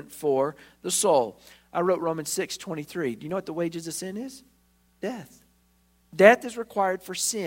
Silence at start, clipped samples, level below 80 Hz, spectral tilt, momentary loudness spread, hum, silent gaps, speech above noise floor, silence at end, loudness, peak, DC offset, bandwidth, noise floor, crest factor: 0 s; under 0.1%; -68 dBFS; -3.5 dB/octave; 17 LU; 60 Hz at -60 dBFS; none; 38 dB; 0 s; -26 LUFS; 0 dBFS; under 0.1%; 16.5 kHz; -64 dBFS; 26 dB